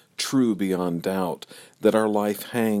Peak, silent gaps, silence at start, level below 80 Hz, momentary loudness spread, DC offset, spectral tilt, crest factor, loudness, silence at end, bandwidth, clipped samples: -6 dBFS; none; 0.2 s; -68 dBFS; 8 LU; under 0.1%; -5.5 dB/octave; 18 dB; -24 LUFS; 0 s; 16.5 kHz; under 0.1%